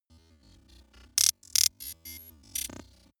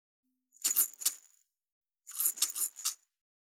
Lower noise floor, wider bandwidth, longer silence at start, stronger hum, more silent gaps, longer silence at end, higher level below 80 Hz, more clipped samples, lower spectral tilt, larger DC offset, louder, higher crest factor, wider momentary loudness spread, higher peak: second, -60 dBFS vs -69 dBFS; about the same, over 20 kHz vs over 20 kHz; first, 1.15 s vs 0.6 s; neither; second, none vs 1.72-1.81 s; about the same, 0.45 s vs 0.45 s; first, -60 dBFS vs under -90 dBFS; neither; first, 1.5 dB/octave vs 4.5 dB/octave; neither; first, -26 LUFS vs -31 LUFS; about the same, 32 dB vs 28 dB; first, 20 LU vs 17 LU; first, -2 dBFS vs -10 dBFS